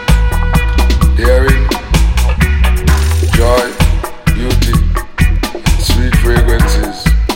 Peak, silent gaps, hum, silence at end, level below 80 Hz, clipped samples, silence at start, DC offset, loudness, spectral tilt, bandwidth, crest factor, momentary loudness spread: 0 dBFS; none; none; 0 s; -12 dBFS; 0.2%; 0 s; under 0.1%; -12 LUFS; -5.5 dB/octave; 17 kHz; 10 dB; 4 LU